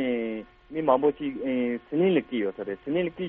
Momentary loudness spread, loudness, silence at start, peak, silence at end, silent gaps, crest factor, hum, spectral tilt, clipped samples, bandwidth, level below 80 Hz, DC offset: 11 LU; -27 LUFS; 0 s; -6 dBFS; 0 s; none; 20 dB; none; -5.5 dB/octave; under 0.1%; 4 kHz; -60 dBFS; under 0.1%